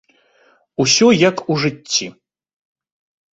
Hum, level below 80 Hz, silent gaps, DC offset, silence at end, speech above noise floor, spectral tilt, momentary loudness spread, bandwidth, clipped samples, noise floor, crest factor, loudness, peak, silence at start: none; -58 dBFS; none; under 0.1%; 1.2 s; 41 dB; -3.5 dB/octave; 12 LU; 8 kHz; under 0.1%; -56 dBFS; 18 dB; -15 LUFS; 0 dBFS; 0.8 s